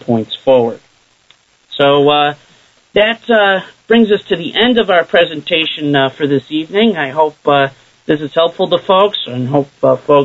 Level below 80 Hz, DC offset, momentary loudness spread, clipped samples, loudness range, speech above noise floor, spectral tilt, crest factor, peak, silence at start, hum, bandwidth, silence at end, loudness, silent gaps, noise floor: -52 dBFS; under 0.1%; 7 LU; under 0.1%; 2 LU; 39 dB; -6.5 dB/octave; 12 dB; 0 dBFS; 0.1 s; none; 7.8 kHz; 0 s; -13 LUFS; none; -51 dBFS